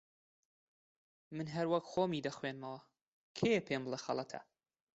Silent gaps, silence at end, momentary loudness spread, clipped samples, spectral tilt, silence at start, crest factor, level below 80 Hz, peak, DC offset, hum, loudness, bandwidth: 3.02-3.35 s; 0.5 s; 15 LU; under 0.1%; -4.5 dB/octave; 1.3 s; 20 dB; -76 dBFS; -20 dBFS; under 0.1%; none; -38 LUFS; 8 kHz